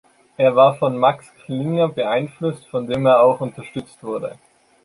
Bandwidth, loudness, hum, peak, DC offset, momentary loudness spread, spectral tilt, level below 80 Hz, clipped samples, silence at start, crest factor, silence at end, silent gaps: 11 kHz; -18 LUFS; none; -2 dBFS; under 0.1%; 17 LU; -7 dB/octave; -60 dBFS; under 0.1%; 0.4 s; 18 dB; 0.5 s; none